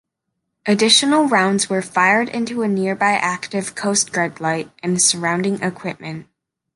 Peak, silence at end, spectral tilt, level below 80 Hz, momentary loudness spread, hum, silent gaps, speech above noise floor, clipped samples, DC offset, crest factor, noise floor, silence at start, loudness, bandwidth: -2 dBFS; 0.55 s; -3 dB/octave; -64 dBFS; 13 LU; none; none; 58 dB; under 0.1%; under 0.1%; 18 dB; -77 dBFS; 0.65 s; -17 LUFS; 11.5 kHz